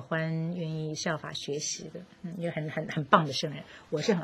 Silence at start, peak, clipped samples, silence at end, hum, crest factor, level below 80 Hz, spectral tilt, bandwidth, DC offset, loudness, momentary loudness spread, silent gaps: 0 s; -6 dBFS; under 0.1%; 0 s; none; 26 dB; -68 dBFS; -4.5 dB/octave; 12 kHz; under 0.1%; -31 LUFS; 14 LU; none